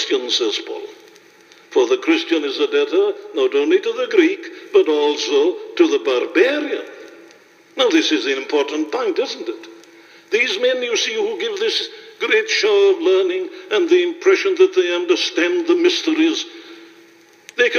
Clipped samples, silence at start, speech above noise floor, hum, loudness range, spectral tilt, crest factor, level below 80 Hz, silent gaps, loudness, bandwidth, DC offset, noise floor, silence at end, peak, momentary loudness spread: under 0.1%; 0 s; 31 dB; none; 4 LU; -1 dB/octave; 18 dB; -80 dBFS; none; -17 LUFS; 7.2 kHz; under 0.1%; -48 dBFS; 0 s; 0 dBFS; 11 LU